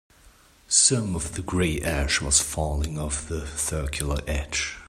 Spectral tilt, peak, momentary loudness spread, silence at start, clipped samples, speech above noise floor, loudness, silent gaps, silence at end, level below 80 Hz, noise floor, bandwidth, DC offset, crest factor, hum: -3 dB/octave; -4 dBFS; 11 LU; 0.25 s; under 0.1%; 29 dB; -24 LUFS; none; 0 s; -34 dBFS; -55 dBFS; 16 kHz; under 0.1%; 22 dB; none